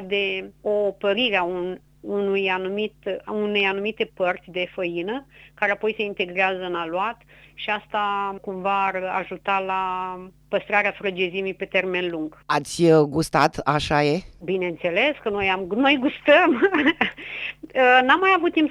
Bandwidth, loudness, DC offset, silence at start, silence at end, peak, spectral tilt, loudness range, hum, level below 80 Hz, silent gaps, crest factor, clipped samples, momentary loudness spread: 14 kHz; -22 LUFS; under 0.1%; 0 s; 0 s; -4 dBFS; -5 dB/octave; 6 LU; none; -54 dBFS; none; 18 dB; under 0.1%; 12 LU